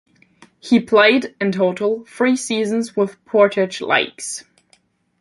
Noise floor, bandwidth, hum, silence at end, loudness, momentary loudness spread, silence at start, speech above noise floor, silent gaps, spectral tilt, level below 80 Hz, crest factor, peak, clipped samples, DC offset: -59 dBFS; 11.5 kHz; none; 0.8 s; -18 LUFS; 11 LU; 0.65 s; 42 dB; none; -4 dB/octave; -66 dBFS; 18 dB; 0 dBFS; under 0.1%; under 0.1%